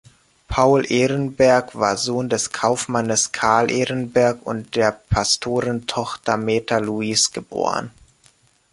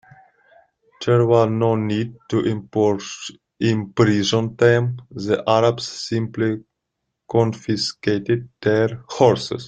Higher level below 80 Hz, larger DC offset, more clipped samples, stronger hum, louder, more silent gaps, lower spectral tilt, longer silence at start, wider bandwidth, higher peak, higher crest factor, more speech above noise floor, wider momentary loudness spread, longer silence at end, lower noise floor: first, -44 dBFS vs -56 dBFS; neither; neither; neither; about the same, -20 LUFS vs -20 LUFS; neither; second, -3.5 dB/octave vs -6 dB/octave; second, 0.5 s vs 1 s; first, 11.5 kHz vs 9 kHz; about the same, -2 dBFS vs -2 dBFS; about the same, 18 dB vs 18 dB; second, 37 dB vs 59 dB; about the same, 8 LU vs 10 LU; first, 0.85 s vs 0 s; second, -57 dBFS vs -78 dBFS